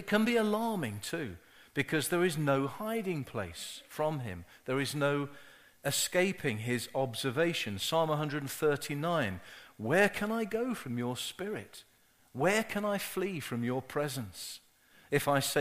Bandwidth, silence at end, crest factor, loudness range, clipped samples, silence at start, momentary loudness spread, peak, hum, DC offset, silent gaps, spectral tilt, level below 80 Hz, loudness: 15.5 kHz; 0 s; 20 dB; 3 LU; under 0.1%; 0 s; 13 LU; -12 dBFS; none; under 0.1%; none; -4.5 dB/octave; -66 dBFS; -33 LUFS